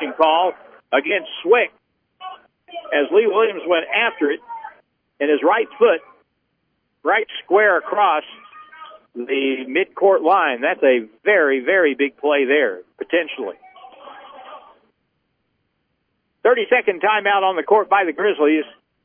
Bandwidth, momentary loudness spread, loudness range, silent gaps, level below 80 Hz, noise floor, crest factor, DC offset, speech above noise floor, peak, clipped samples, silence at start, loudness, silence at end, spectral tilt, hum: 3.6 kHz; 15 LU; 6 LU; none; -76 dBFS; -71 dBFS; 18 dB; under 0.1%; 53 dB; -2 dBFS; under 0.1%; 0 s; -18 LUFS; 0.4 s; -7 dB/octave; none